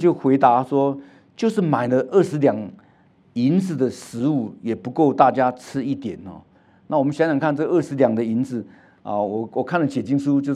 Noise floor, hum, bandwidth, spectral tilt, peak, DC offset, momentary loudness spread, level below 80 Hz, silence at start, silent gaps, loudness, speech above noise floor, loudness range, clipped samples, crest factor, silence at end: -55 dBFS; none; 11.5 kHz; -7.5 dB/octave; 0 dBFS; under 0.1%; 12 LU; -70 dBFS; 0 s; none; -21 LUFS; 35 dB; 2 LU; under 0.1%; 20 dB; 0 s